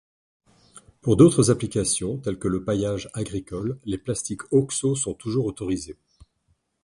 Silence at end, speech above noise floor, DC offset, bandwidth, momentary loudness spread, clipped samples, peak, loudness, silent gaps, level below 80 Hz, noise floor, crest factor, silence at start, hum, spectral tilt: 0.9 s; 46 dB; under 0.1%; 11.5 kHz; 14 LU; under 0.1%; -2 dBFS; -24 LUFS; none; -48 dBFS; -69 dBFS; 22 dB; 0.75 s; none; -6 dB/octave